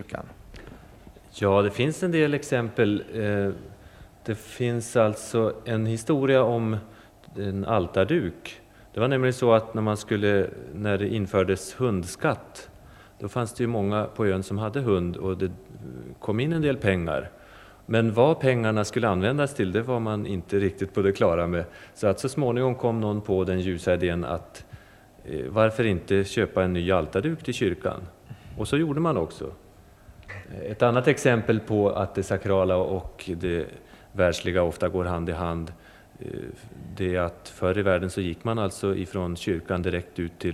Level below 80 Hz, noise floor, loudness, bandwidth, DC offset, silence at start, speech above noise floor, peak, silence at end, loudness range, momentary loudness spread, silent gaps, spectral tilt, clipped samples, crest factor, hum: -52 dBFS; -51 dBFS; -25 LUFS; 14.5 kHz; under 0.1%; 0 s; 26 dB; -4 dBFS; 0 s; 4 LU; 16 LU; none; -6.5 dB/octave; under 0.1%; 22 dB; none